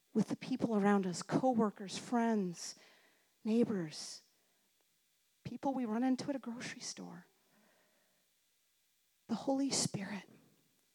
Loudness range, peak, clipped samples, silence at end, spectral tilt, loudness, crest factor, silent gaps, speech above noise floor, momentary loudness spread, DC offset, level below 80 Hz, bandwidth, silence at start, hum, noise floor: 7 LU; -18 dBFS; under 0.1%; 0.7 s; -5 dB/octave; -37 LUFS; 20 dB; none; 41 dB; 15 LU; under 0.1%; -84 dBFS; 15 kHz; 0.15 s; none; -77 dBFS